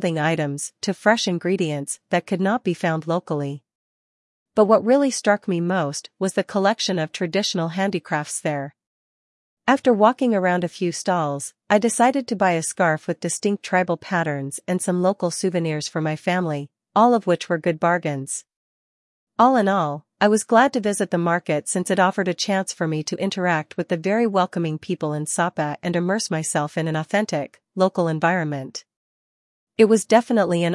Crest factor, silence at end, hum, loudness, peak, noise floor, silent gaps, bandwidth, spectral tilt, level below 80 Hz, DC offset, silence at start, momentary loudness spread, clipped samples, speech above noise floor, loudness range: 20 dB; 0 s; none; -21 LUFS; -2 dBFS; under -90 dBFS; 3.75-4.46 s, 8.87-9.57 s, 18.56-19.27 s, 28.96-29.67 s; 12 kHz; -5 dB/octave; -72 dBFS; under 0.1%; 0 s; 10 LU; under 0.1%; over 69 dB; 3 LU